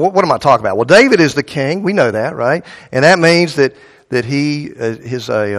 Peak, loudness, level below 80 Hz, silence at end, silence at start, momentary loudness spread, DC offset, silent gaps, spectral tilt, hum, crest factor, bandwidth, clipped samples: 0 dBFS; -13 LUFS; -52 dBFS; 0 s; 0 s; 12 LU; under 0.1%; none; -5.5 dB/octave; none; 12 dB; 13 kHz; 0.2%